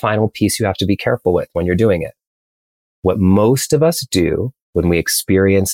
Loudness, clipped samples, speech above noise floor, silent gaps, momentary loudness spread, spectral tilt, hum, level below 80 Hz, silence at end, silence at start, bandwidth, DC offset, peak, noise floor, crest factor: -16 LUFS; under 0.1%; over 75 dB; 2.27-3.03 s, 4.62-4.73 s; 7 LU; -5 dB/octave; none; -40 dBFS; 0 s; 0.05 s; 17 kHz; under 0.1%; -2 dBFS; under -90 dBFS; 14 dB